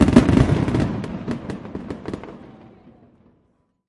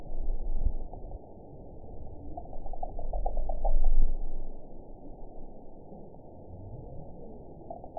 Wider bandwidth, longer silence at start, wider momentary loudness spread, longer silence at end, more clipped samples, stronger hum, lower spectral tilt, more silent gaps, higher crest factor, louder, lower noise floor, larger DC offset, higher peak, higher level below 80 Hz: first, 11.5 kHz vs 1 kHz; about the same, 0 s vs 0 s; first, 19 LU vs 16 LU; first, 1.4 s vs 0 s; neither; neither; second, -7.5 dB/octave vs -14.5 dB/octave; neither; about the same, 22 dB vs 18 dB; first, -21 LUFS vs -40 LUFS; first, -65 dBFS vs -47 dBFS; second, under 0.1% vs 0.3%; first, 0 dBFS vs -10 dBFS; about the same, -34 dBFS vs -30 dBFS